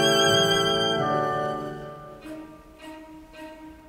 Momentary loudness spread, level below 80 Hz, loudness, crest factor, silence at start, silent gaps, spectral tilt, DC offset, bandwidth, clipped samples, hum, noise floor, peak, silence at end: 25 LU; -54 dBFS; -22 LUFS; 18 dB; 0 s; none; -3 dB/octave; under 0.1%; 16 kHz; under 0.1%; none; -44 dBFS; -8 dBFS; 0 s